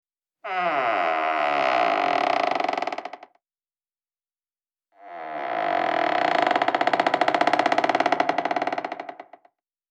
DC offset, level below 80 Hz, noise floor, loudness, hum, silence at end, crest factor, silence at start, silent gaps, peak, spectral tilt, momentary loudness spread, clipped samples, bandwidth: under 0.1%; -82 dBFS; under -90 dBFS; -23 LUFS; none; 0.7 s; 20 dB; 0.45 s; none; -6 dBFS; -4 dB/octave; 14 LU; under 0.1%; 8.6 kHz